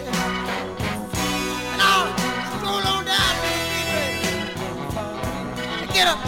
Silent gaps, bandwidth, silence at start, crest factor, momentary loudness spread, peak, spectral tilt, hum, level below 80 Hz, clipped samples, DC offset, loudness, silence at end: none; 17 kHz; 0 s; 18 dB; 10 LU; -4 dBFS; -3 dB/octave; none; -42 dBFS; under 0.1%; under 0.1%; -22 LUFS; 0 s